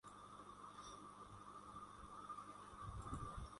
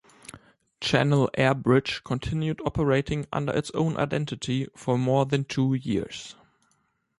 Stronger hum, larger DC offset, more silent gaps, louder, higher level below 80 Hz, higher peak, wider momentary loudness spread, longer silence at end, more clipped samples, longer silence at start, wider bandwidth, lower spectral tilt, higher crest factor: first, 50 Hz at -70 dBFS vs none; neither; neither; second, -55 LUFS vs -26 LUFS; second, -62 dBFS vs -50 dBFS; second, -34 dBFS vs -8 dBFS; second, 7 LU vs 10 LU; second, 0 s vs 0.9 s; neither; second, 0.05 s vs 0.35 s; about the same, 11.5 kHz vs 11.5 kHz; second, -5 dB/octave vs -6.5 dB/octave; about the same, 20 dB vs 18 dB